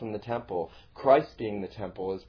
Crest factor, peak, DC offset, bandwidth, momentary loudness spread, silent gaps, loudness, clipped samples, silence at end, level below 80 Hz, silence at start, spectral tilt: 22 dB; -8 dBFS; under 0.1%; 5.4 kHz; 13 LU; none; -29 LUFS; under 0.1%; 0.05 s; -58 dBFS; 0 s; -5.5 dB/octave